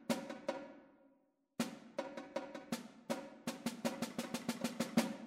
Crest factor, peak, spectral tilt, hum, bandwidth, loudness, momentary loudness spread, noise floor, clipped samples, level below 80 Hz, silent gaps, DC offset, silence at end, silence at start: 24 dB; -20 dBFS; -4 dB/octave; none; 16 kHz; -43 LUFS; 9 LU; -75 dBFS; under 0.1%; -80 dBFS; none; under 0.1%; 0 s; 0 s